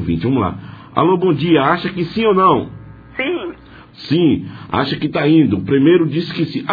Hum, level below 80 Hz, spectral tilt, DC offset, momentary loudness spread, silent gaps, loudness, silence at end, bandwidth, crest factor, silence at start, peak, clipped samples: none; -46 dBFS; -9 dB/octave; under 0.1%; 11 LU; none; -16 LUFS; 0 s; 5 kHz; 16 dB; 0 s; 0 dBFS; under 0.1%